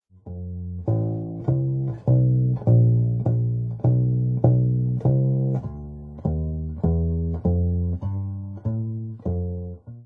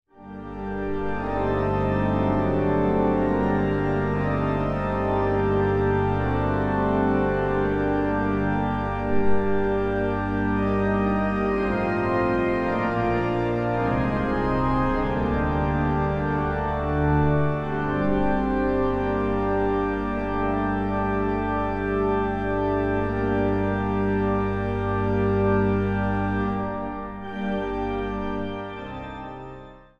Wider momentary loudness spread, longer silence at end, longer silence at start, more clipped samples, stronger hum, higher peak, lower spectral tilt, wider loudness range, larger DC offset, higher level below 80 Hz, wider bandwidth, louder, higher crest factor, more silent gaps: first, 13 LU vs 6 LU; second, 0 s vs 0.2 s; about the same, 0.25 s vs 0.2 s; neither; second, none vs 50 Hz at -40 dBFS; about the same, -6 dBFS vs -8 dBFS; first, -14 dB/octave vs -9.5 dB/octave; first, 5 LU vs 2 LU; neither; about the same, -38 dBFS vs -36 dBFS; second, 1.5 kHz vs 6.8 kHz; about the same, -23 LUFS vs -24 LUFS; about the same, 18 dB vs 14 dB; neither